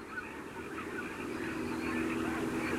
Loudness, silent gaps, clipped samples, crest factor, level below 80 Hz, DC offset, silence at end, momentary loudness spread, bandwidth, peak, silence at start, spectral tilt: -37 LUFS; none; under 0.1%; 16 dB; -60 dBFS; under 0.1%; 0 s; 8 LU; 16 kHz; -22 dBFS; 0 s; -5 dB/octave